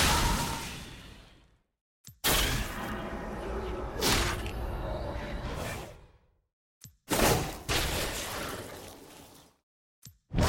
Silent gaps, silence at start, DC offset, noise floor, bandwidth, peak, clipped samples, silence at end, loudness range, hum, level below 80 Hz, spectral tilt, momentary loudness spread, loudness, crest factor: 1.81-2.04 s, 6.53-6.81 s, 9.63-10.02 s; 0 s; under 0.1%; -62 dBFS; 17 kHz; -12 dBFS; under 0.1%; 0 s; 3 LU; none; -40 dBFS; -3.5 dB/octave; 20 LU; -31 LUFS; 20 dB